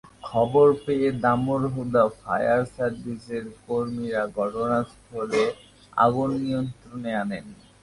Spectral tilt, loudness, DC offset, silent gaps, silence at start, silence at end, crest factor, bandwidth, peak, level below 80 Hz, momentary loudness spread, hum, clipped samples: -7 dB/octave; -25 LUFS; under 0.1%; none; 0.05 s; 0.3 s; 18 dB; 11.5 kHz; -6 dBFS; -54 dBFS; 13 LU; none; under 0.1%